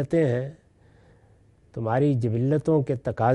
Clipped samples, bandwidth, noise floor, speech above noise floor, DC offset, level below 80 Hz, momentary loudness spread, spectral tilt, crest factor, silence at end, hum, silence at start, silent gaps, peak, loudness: under 0.1%; 10 kHz; -57 dBFS; 34 dB; under 0.1%; -56 dBFS; 10 LU; -9.5 dB/octave; 18 dB; 0 s; none; 0 s; none; -8 dBFS; -24 LUFS